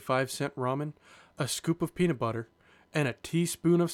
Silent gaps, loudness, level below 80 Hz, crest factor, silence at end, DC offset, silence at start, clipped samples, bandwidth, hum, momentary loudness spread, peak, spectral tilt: none; -31 LUFS; -62 dBFS; 16 dB; 0 s; under 0.1%; 0 s; under 0.1%; 16.5 kHz; none; 9 LU; -14 dBFS; -5.5 dB/octave